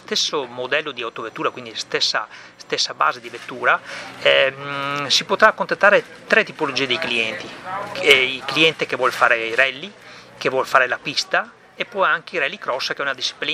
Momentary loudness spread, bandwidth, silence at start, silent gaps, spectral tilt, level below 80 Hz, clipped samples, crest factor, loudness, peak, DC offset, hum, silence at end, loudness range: 14 LU; 15.5 kHz; 0.1 s; none; -2 dB/octave; -64 dBFS; under 0.1%; 20 dB; -19 LUFS; 0 dBFS; under 0.1%; none; 0 s; 5 LU